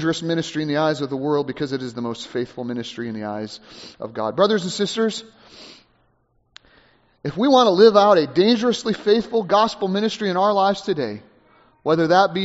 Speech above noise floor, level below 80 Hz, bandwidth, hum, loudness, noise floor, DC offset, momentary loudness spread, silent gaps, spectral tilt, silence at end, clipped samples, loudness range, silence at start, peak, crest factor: 44 dB; -60 dBFS; 8 kHz; none; -20 LUFS; -64 dBFS; under 0.1%; 15 LU; none; -4 dB/octave; 0 s; under 0.1%; 9 LU; 0 s; 0 dBFS; 20 dB